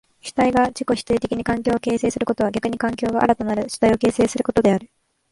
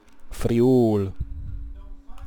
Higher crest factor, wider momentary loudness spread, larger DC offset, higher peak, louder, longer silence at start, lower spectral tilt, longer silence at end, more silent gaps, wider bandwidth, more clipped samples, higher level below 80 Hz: about the same, 18 dB vs 14 dB; second, 5 LU vs 23 LU; second, under 0.1% vs 0.7%; first, -2 dBFS vs -10 dBFS; about the same, -20 LUFS vs -21 LUFS; first, 0.25 s vs 0 s; second, -5.5 dB/octave vs -8.5 dB/octave; first, 0.45 s vs 0 s; neither; second, 11.5 kHz vs 19.5 kHz; neither; second, -46 dBFS vs -36 dBFS